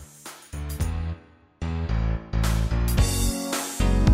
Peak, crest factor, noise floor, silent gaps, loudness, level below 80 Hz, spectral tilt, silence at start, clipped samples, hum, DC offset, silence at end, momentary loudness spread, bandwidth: -6 dBFS; 18 dB; -44 dBFS; none; -26 LUFS; -28 dBFS; -5 dB/octave; 0 s; under 0.1%; none; under 0.1%; 0 s; 14 LU; 16 kHz